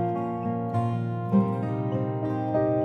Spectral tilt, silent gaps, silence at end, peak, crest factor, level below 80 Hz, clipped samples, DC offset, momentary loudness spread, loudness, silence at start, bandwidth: -10.5 dB/octave; none; 0 s; -10 dBFS; 16 dB; -60 dBFS; under 0.1%; under 0.1%; 5 LU; -27 LUFS; 0 s; 4.4 kHz